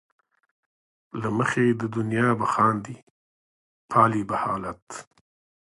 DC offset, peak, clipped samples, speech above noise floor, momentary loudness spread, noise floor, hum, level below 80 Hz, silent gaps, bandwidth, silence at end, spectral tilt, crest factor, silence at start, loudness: under 0.1%; -4 dBFS; under 0.1%; over 66 dB; 19 LU; under -90 dBFS; none; -60 dBFS; 3.03-3.89 s, 4.82-4.87 s; 11.5 kHz; 0.7 s; -6.5 dB/octave; 22 dB; 1.15 s; -24 LUFS